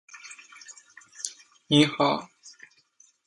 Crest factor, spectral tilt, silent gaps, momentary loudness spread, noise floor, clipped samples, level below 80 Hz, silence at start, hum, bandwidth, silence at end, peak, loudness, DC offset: 24 dB; -4.5 dB/octave; none; 27 LU; -62 dBFS; under 0.1%; -70 dBFS; 0.15 s; none; 11.5 kHz; 0.75 s; -6 dBFS; -25 LUFS; under 0.1%